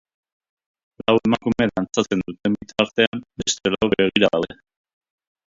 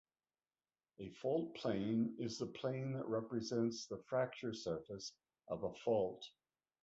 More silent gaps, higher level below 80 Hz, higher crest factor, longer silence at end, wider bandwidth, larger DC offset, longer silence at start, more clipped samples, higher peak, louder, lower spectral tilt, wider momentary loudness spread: first, 3.07-3.12 s vs none; first, -52 dBFS vs -74 dBFS; about the same, 22 dB vs 18 dB; first, 0.95 s vs 0.55 s; about the same, 7.8 kHz vs 8 kHz; neither; about the same, 1.1 s vs 1 s; neither; first, 0 dBFS vs -26 dBFS; first, -21 LUFS vs -42 LUFS; second, -4 dB/octave vs -6 dB/octave; second, 7 LU vs 11 LU